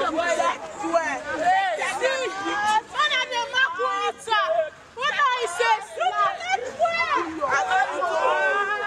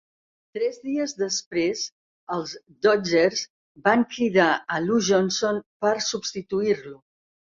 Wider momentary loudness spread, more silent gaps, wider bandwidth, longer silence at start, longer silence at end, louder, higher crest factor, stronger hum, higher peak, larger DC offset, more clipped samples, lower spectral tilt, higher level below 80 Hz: second, 5 LU vs 11 LU; second, none vs 1.46-1.51 s, 1.92-2.27 s, 3.50-3.75 s, 5.66-5.80 s; first, 13.5 kHz vs 7.6 kHz; second, 0 s vs 0.55 s; second, 0 s vs 0.65 s; about the same, -23 LUFS vs -24 LUFS; second, 14 dB vs 20 dB; neither; second, -10 dBFS vs -4 dBFS; neither; neither; second, -1.5 dB/octave vs -3.5 dB/octave; about the same, -64 dBFS vs -66 dBFS